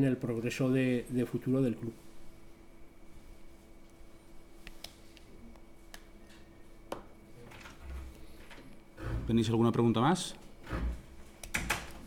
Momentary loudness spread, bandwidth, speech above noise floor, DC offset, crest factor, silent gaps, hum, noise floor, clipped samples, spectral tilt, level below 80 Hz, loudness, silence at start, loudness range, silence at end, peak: 27 LU; 18 kHz; 23 dB; under 0.1%; 20 dB; none; none; -53 dBFS; under 0.1%; -6 dB/octave; -48 dBFS; -32 LUFS; 0 s; 22 LU; 0 s; -16 dBFS